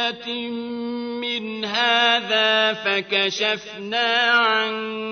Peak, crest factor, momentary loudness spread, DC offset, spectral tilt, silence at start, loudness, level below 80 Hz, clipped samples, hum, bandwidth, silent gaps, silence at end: -6 dBFS; 16 dB; 11 LU; under 0.1%; -2.5 dB/octave; 0 s; -20 LUFS; -70 dBFS; under 0.1%; none; 6.6 kHz; none; 0 s